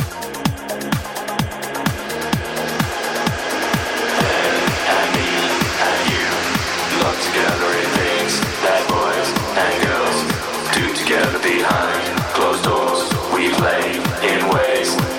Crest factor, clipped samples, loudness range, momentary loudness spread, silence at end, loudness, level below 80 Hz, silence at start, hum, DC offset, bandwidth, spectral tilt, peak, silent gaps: 16 dB; under 0.1%; 4 LU; 6 LU; 0 s; -18 LUFS; -40 dBFS; 0 s; none; under 0.1%; 17 kHz; -3.5 dB/octave; -2 dBFS; none